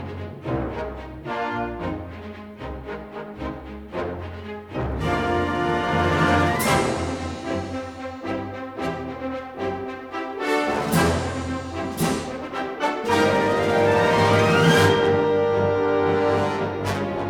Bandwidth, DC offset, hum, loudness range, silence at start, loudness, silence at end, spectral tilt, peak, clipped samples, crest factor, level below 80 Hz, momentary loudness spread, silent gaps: 18.5 kHz; under 0.1%; none; 12 LU; 0 s; -23 LUFS; 0 s; -5.5 dB/octave; -6 dBFS; under 0.1%; 18 dB; -42 dBFS; 16 LU; none